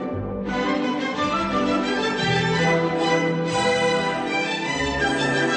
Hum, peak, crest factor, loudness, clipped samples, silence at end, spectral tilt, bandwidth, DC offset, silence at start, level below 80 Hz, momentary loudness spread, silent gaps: none; -10 dBFS; 12 dB; -22 LUFS; under 0.1%; 0 s; -4.5 dB/octave; 8.6 kHz; under 0.1%; 0 s; -46 dBFS; 4 LU; none